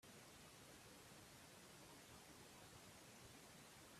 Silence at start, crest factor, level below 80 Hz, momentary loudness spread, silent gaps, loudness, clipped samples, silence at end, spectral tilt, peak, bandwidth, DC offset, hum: 0 s; 14 dB; -80 dBFS; 0 LU; none; -62 LUFS; under 0.1%; 0 s; -3 dB/octave; -50 dBFS; 15.5 kHz; under 0.1%; none